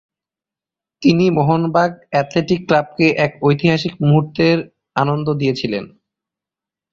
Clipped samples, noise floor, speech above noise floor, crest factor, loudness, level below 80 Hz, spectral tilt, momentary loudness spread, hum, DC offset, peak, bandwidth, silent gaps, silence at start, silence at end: under 0.1%; -88 dBFS; 73 dB; 16 dB; -17 LUFS; -52 dBFS; -7.5 dB/octave; 6 LU; none; under 0.1%; -2 dBFS; 7.2 kHz; none; 1 s; 1.05 s